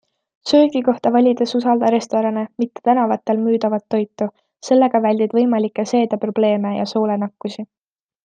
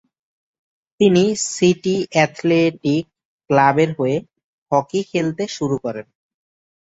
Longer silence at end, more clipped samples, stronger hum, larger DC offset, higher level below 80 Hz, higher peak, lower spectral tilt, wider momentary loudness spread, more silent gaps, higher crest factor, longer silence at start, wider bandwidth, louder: second, 0.6 s vs 0.85 s; neither; neither; neither; second, -68 dBFS vs -60 dBFS; about the same, -2 dBFS vs -2 dBFS; about the same, -6 dB/octave vs -5.5 dB/octave; first, 11 LU vs 8 LU; second, none vs 3.25-3.38 s, 4.44-4.66 s; about the same, 16 dB vs 18 dB; second, 0.45 s vs 1 s; about the same, 9 kHz vs 8.2 kHz; about the same, -18 LUFS vs -18 LUFS